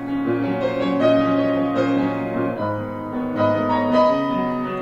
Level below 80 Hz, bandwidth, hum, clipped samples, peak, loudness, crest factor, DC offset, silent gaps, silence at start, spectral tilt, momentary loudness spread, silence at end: -50 dBFS; 7.4 kHz; none; under 0.1%; -4 dBFS; -20 LUFS; 16 dB; under 0.1%; none; 0 s; -8 dB/octave; 8 LU; 0 s